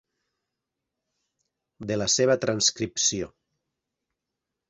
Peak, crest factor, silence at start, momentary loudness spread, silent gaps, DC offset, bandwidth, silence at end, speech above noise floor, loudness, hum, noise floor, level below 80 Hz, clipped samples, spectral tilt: -8 dBFS; 22 dB; 1.8 s; 14 LU; none; under 0.1%; 8.4 kHz; 1.45 s; 60 dB; -24 LUFS; none; -85 dBFS; -60 dBFS; under 0.1%; -2.5 dB/octave